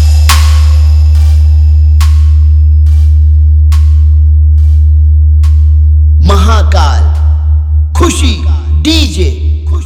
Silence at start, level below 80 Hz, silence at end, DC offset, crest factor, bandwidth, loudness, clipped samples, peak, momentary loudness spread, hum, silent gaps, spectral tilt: 0 s; -6 dBFS; 0 s; under 0.1%; 4 dB; 12 kHz; -7 LUFS; 0.4%; 0 dBFS; 4 LU; none; none; -6 dB/octave